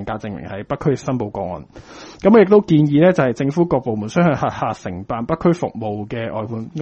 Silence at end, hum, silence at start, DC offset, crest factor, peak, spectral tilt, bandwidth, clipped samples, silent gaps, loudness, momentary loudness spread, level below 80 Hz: 0 s; none; 0 s; under 0.1%; 18 dB; 0 dBFS; -8 dB/octave; 8.4 kHz; under 0.1%; none; -18 LUFS; 15 LU; -46 dBFS